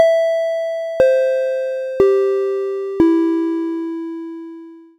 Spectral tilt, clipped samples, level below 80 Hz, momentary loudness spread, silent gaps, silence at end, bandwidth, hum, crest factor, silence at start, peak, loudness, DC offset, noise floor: -6 dB/octave; under 0.1%; -52 dBFS; 15 LU; none; 0.15 s; 9.4 kHz; none; 16 dB; 0 s; 0 dBFS; -18 LUFS; under 0.1%; -37 dBFS